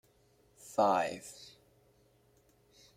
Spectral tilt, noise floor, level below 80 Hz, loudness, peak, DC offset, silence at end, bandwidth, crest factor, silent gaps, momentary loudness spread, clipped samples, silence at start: -4 dB/octave; -68 dBFS; -76 dBFS; -32 LUFS; -16 dBFS; under 0.1%; 1.5 s; 16 kHz; 22 dB; none; 26 LU; under 0.1%; 0.65 s